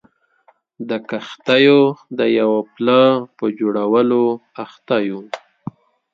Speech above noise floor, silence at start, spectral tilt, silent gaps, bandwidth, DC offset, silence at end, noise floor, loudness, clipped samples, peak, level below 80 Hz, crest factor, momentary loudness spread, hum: 40 dB; 0.8 s; -7 dB/octave; none; 7.6 kHz; under 0.1%; 0.75 s; -57 dBFS; -17 LUFS; under 0.1%; 0 dBFS; -68 dBFS; 18 dB; 20 LU; none